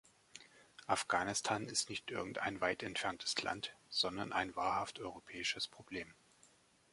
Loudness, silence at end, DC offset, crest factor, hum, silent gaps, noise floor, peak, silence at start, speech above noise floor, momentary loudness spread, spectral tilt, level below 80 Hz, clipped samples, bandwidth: -39 LUFS; 0.8 s; under 0.1%; 24 dB; none; none; -69 dBFS; -16 dBFS; 0.35 s; 29 dB; 18 LU; -2 dB/octave; -70 dBFS; under 0.1%; 11.5 kHz